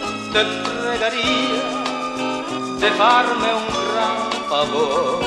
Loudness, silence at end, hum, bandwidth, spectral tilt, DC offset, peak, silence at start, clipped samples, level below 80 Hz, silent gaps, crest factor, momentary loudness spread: -19 LUFS; 0 s; none; 12.5 kHz; -3 dB/octave; under 0.1%; -2 dBFS; 0 s; under 0.1%; -50 dBFS; none; 18 dB; 9 LU